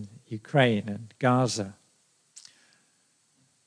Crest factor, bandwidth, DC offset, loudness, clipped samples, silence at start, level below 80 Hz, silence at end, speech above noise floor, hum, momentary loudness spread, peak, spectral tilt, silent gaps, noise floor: 22 dB; 10.5 kHz; under 0.1%; -26 LUFS; under 0.1%; 0 s; -76 dBFS; 1.95 s; 42 dB; none; 16 LU; -8 dBFS; -5.5 dB/octave; none; -68 dBFS